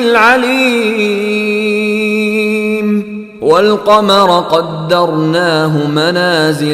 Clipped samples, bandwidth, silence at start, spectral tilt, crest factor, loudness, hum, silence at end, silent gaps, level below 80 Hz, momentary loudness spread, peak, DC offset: under 0.1%; 15 kHz; 0 s; -5 dB/octave; 10 dB; -11 LUFS; none; 0 s; none; -52 dBFS; 6 LU; 0 dBFS; under 0.1%